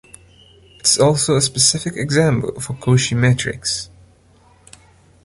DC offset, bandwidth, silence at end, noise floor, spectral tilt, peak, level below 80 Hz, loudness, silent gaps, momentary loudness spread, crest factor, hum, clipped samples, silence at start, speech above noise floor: under 0.1%; 11.5 kHz; 1.4 s; -51 dBFS; -4 dB/octave; 0 dBFS; -46 dBFS; -16 LUFS; none; 10 LU; 18 dB; none; under 0.1%; 0.85 s; 35 dB